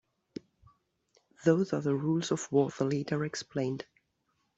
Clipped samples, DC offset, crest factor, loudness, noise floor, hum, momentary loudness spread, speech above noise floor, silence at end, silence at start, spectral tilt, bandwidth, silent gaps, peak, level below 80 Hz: under 0.1%; under 0.1%; 20 dB; -31 LUFS; -77 dBFS; none; 20 LU; 48 dB; 0.75 s; 1.4 s; -6 dB/octave; 8.2 kHz; none; -12 dBFS; -70 dBFS